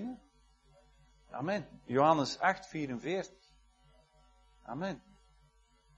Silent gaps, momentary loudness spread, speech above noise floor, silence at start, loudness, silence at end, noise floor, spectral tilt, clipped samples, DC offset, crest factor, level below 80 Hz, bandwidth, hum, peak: none; 20 LU; 34 dB; 0 s; -34 LUFS; 1 s; -67 dBFS; -5.5 dB/octave; under 0.1%; under 0.1%; 24 dB; -66 dBFS; 11 kHz; none; -12 dBFS